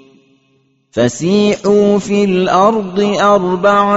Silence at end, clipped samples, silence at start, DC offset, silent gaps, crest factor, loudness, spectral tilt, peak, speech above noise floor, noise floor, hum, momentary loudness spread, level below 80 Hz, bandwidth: 0 s; under 0.1%; 0.95 s; under 0.1%; none; 12 dB; -12 LUFS; -5 dB/octave; 0 dBFS; 45 dB; -57 dBFS; none; 5 LU; -50 dBFS; 8 kHz